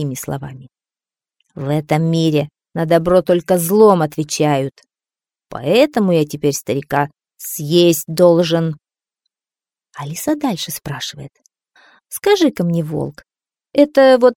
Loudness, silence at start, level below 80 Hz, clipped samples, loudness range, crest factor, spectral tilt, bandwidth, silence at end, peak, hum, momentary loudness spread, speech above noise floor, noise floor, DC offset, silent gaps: -16 LUFS; 0 s; -52 dBFS; under 0.1%; 6 LU; 16 dB; -5.5 dB/octave; 18 kHz; 0.05 s; 0 dBFS; none; 16 LU; over 75 dB; under -90 dBFS; under 0.1%; none